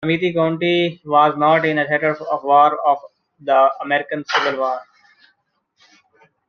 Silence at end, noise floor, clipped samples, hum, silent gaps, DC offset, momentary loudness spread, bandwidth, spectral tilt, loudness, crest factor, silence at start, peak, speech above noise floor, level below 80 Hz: 1.65 s; -67 dBFS; under 0.1%; none; none; under 0.1%; 9 LU; 6.8 kHz; -6 dB/octave; -17 LUFS; 16 dB; 0 s; -2 dBFS; 50 dB; -66 dBFS